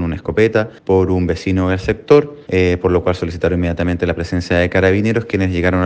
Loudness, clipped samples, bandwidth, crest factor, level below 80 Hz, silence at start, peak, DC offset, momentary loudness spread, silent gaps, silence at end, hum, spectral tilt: -16 LUFS; under 0.1%; 8.6 kHz; 16 dB; -34 dBFS; 0 s; 0 dBFS; under 0.1%; 6 LU; none; 0 s; none; -7.5 dB/octave